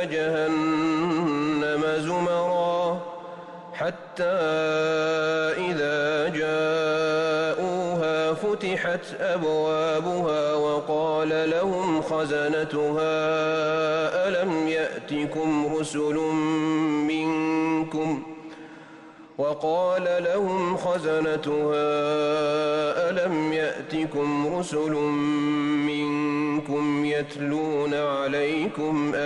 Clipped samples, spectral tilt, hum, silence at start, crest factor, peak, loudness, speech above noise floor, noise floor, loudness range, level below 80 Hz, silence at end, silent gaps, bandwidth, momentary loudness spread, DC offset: under 0.1%; -5.5 dB/octave; none; 0 s; 10 dB; -16 dBFS; -25 LUFS; 22 dB; -46 dBFS; 2 LU; -64 dBFS; 0 s; none; 11 kHz; 5 LU; under 0.1%